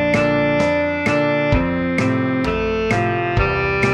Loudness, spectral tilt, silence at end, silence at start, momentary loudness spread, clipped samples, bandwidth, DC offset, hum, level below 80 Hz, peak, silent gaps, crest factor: -18 LUFS; -6.5 dB/octave; 0 s; 0 s; 3 LU; under 0.1%; 11 kHz; under 0.1%; none; -32 dBFS; -4 dBFS; none; 14 dB